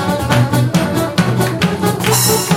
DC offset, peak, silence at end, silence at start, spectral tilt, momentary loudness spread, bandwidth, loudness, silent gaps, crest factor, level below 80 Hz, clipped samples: under 0.1%; 0 dBFS; 0 s; 0 s; -4.5 dB/octave; 4 LU; 16.5 kHz; -14 LUFS; none; 14 dB; -38 dBFS; under 0.1%